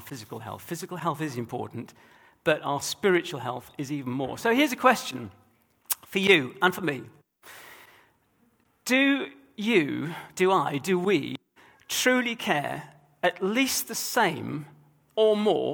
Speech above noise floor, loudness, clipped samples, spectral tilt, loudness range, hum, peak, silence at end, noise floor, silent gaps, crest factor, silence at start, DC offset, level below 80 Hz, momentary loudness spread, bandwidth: 40 dB; -26 LUFS; under 0.1%; -4 dB/octave; 4 LU; none; -4 dBFS; 0 s; -66 dBFS; none; 22 dB; 0 s; under 0.1%; -70 dBFS; 16 LU; over 20 kHz